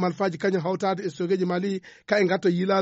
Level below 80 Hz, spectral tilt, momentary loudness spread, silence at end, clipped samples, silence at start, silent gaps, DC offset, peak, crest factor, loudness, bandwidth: -70 dBFS; -5.5 dB/octave; 6 LU; 0 s; under 0.1%; 0 s; none; under 0.1%; -10 dBFS; 14 dB; -25 LUFS; 8 kHz